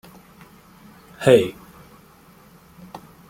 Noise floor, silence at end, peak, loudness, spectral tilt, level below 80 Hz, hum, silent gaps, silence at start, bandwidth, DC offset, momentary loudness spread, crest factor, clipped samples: -50 dBFS; 1.8 s; -2 dBFS; -18 LUFS; -6 dB/octave; -58 dBFS; none; none; 1.2 s; 16.5 kHz; under 0.1%; 26 LU; 22 dB; under 0.1%